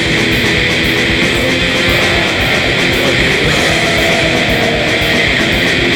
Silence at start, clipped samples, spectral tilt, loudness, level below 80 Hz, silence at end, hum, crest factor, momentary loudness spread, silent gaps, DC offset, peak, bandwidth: 0 s; under 0.1%; -4 dB/octave; -10 LUFS; -28 dBFS; 0 s; none; 12 dB; 1 LU; none; under 0.1%; 0 dBFS; 18 kHz